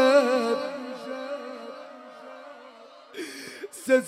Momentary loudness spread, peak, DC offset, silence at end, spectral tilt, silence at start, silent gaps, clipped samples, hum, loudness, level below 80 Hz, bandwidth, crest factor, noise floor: 21 LU; -8 dBFS; under 0.1%; 0 s; -3 dB/octave; 0 s; none; under 0.1%; none; -28 LUFS; -86 dBFS; 15.5 kHz; 20 dB; -49 dBFS